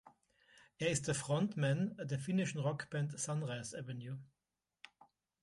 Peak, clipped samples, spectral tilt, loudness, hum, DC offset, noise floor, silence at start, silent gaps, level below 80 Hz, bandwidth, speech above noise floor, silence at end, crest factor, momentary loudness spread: -22 dBFS; under 0.1%; -5 dB/octave; -39 LUFS; none; under 0.1%; under -90 dBFS; 0.05 s; none; -72 dBFS; 11.5 kHz; over 52 dB; 1.2 s; 18 dB; 12 LU